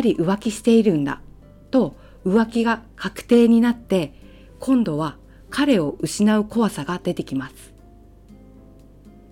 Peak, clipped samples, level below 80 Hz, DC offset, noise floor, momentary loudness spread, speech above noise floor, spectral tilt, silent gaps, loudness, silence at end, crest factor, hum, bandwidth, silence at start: -6 dBFS; under 0.1%; -48 dBFS; under 0.1%; -47 dBFS; 13 LU; 28 dB; -6 dB/octave; none; -20 LUFS; 0.2 s; 16 dB; none; 15 kHz; 0 s